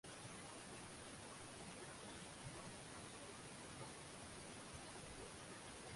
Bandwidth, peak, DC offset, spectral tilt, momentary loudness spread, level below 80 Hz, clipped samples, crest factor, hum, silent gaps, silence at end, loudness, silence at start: 11.5 kHz; -40 dBFS; under 0.1%; -3 dB/octave; 1 LU; -70 dBFS; under 0.1%; 16 dB; none; none; 0 s; -54 LUFS; 0.05 s